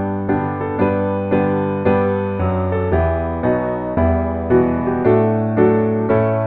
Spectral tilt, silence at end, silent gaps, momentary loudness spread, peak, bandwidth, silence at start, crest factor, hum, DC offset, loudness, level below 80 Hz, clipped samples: -12 dB/octave; 0 s; none; 5 LU; -2 dBFS; 4.2 kHz; 0 s; 16 dB; none; under 0.1%; -17 LUFS; -34 dBFS; under 0.1%